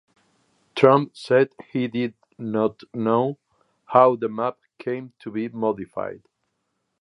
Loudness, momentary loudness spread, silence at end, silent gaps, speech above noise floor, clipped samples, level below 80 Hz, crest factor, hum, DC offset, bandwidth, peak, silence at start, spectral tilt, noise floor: -23 LUFS; 15 LU; 0.85 s; none; 54 dB; under 0.1%; -68 dBFS; 22 dB; none; under 0.1%; 10.5 kHz; 0 dBFS; 0.75 s; -7.5 dB/octave; -75 dBFS